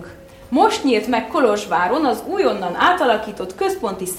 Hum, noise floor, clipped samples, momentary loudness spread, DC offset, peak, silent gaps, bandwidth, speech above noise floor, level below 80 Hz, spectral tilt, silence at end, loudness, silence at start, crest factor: none; -39 dBFS; under 0.1%; 7 LU; under 0.1%; -2 dBFS; none; 16.5 kHz; 21 dB; -50 dBFS; -4 dB/octave; 0 s; -18 LUFS; 0 s; 18 dB